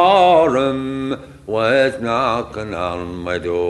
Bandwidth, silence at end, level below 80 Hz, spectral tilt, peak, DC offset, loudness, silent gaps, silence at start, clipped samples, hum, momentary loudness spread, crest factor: 11.5 kHz; 0 s; -46 dBFS; -5.5 dB/octave; -2 dBFS; under 0.1%; -18 LUFS; none; 0 s; under 0.1%; none; 14 LU; 16 dB